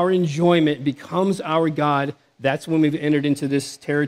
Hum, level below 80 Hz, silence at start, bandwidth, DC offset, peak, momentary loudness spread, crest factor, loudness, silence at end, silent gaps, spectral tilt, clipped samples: none; -66 dBFS; 0 s; 13 kHz; under 0.1%; -4 dBFS; 7 LU; 16 dB; -21 LUFS; 0 s; none; -6.5 dB/octave; under 0.1%